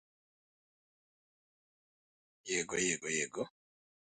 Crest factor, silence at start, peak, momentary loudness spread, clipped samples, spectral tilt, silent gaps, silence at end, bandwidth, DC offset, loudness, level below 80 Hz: 22 dB; 2.45 s; -20 dBFS; 12 LU; under 0.1%; -2 dB/octave; none; 0.65 s; 9.4 kHz; under 0.1%; -36 LUFS; -74 dBFS